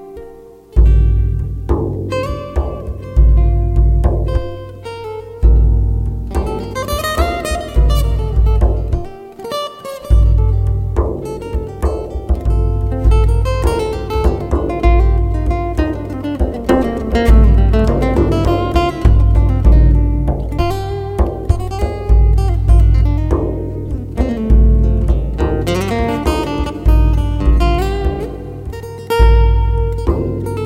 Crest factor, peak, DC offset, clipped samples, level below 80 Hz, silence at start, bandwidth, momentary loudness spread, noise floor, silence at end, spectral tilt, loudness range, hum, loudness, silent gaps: 12 dB; 0 dBFS; under 0.1%; under 0.1%; -14 dBFS; 0 s; 12.5 kHz; 11 LU; -37 dBFS; 0 s; -7.5 dB/octave; 4 LU; none; -16 LUFS; none